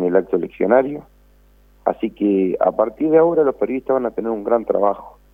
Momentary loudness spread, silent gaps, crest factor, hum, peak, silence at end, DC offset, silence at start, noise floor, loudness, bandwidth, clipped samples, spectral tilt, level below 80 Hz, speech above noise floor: 9 LU; none; 18 dB; 50 Hz at -50 dBFS; 0 dBFS; 0.25 s; under 0.1%; 0 s; -51 dBFS; -19 LUFS; 3.7 kHz; under 0.1%; -10 dB/octave; -52 dBFS; 34 dB